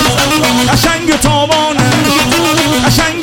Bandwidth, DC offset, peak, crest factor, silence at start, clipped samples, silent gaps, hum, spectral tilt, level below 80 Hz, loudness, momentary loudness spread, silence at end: 17 kHz; 0.3%; 0 dBFS; 10 dB; 0 s; under 0.1%; none; none; -3.5 dB/octave; -28 dBFS; -10 LUFS; 1 LU; 0 s